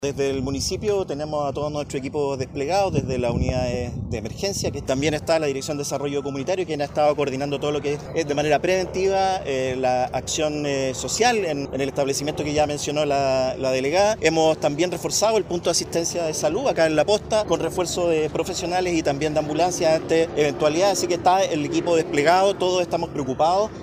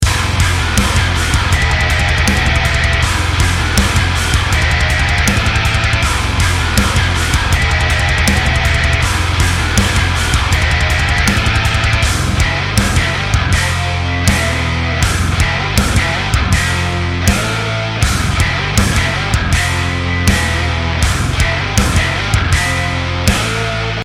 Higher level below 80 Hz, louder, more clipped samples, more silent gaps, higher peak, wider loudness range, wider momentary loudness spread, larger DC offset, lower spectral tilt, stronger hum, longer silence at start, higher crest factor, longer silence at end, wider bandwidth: second, -44 dBFS vs -20 dBFS; second, -22 LUFS vs -13 LUFS; neither; neither; second, -4 dBFS vs 0 dBFS; first, 4 LU vs 1 LU; first, 7 LU vs 3 LU; neither; about the same, -4.5 dB/octave vs -4 dB/octave; neither; about the same, 0 s vs 0 s; about the same, 18 dB vs 14 dB; about the same, 0 s vs 0 s; about the same, 15.5 kHz vs 16.5 kHz